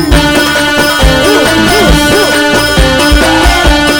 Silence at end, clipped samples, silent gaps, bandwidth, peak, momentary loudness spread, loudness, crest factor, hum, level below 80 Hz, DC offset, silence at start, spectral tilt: 0 s; 0.9%; none; over 20 kHz; 0 dBFS; 1 LU; -6 LUFS; 6 dB; none; -14 dBFS; under 0.1%; 0 s; -4 dB/octave